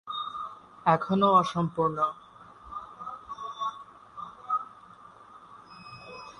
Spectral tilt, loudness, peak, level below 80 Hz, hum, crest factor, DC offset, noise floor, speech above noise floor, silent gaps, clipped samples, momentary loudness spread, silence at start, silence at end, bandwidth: -6.5 dB/octave; -28 LUFS; -8 dBFS; -66 dBFS; 50 Hz at -65 dBFS; 22 dB; under 0.1%; -51 dBFS; 27 dB; none; under 0.1%; 25 LU; 0.05 s; 0.05 s; 10.5 kHz